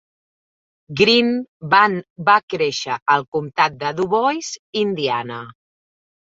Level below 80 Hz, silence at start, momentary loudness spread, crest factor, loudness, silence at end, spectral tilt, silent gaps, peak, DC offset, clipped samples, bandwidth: -60 dBFS; 0.9 s; 11 LU; 18 dB; -18 LUFS; 0.9 s; -4 dB/octave; 1.49-1.60 s, 2.10-2.16 s, 2.43-2.48 s, 3.02-3.06 s, 3.28-3.32 s, 4.59-4.73 s; -2 dBFS; under 0.1%; under 0.1%; 7.8 kHz